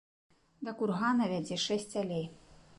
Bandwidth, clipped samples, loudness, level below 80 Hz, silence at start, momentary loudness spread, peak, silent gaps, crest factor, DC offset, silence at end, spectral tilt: 11.5 kHz; under 0.1%; -33 LUFS; -68 dBFS; 0.6 s; 14 LU; -20 dBFS; none; 14 dB; under 0.1%; 0.25 s; -5 dB/octave